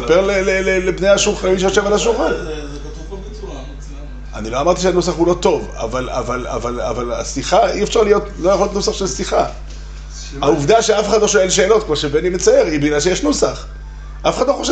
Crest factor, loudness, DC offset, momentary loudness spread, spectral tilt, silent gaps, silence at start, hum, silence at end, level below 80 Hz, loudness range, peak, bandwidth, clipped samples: 14 dB; -16 LUFS; under 0.1%; 18 LU; -4 dB/octave; none; 0 s; none; 0 s; -30 dBFS; 5 LU; -2 dBFS; 9 kHz; under 0.1%